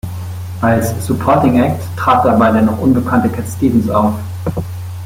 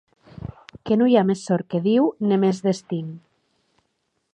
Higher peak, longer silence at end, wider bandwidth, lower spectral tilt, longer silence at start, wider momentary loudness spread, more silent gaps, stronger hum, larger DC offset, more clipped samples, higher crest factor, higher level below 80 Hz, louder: first, 0 dBFS vs -4 dBFS; second, 0 s vs 1.15 s; first, 16.5 kHz vs 9.6 kHz; about the same, -7.5 dB/octave vs -7 dB/octave; second, 0.05 s vs 0.4 s; second, 11 LU vs 21 LU; neither; neither; neither; neither; second, 12 dB vs 18 dB; first, -40 dBFS vs -56 dBFS; first, -14 LUFS vs -21 LUFS